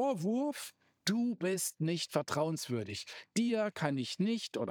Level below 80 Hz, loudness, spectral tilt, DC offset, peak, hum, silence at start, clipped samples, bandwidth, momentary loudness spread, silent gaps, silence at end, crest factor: -82 dBFS; -35 LUFS; -4.5 dB/octave; under 0.1%; -16 dBFS; none; 0 s; under 0.1%; over 20 kHz; 5 LU; none; 0 s; 20 dB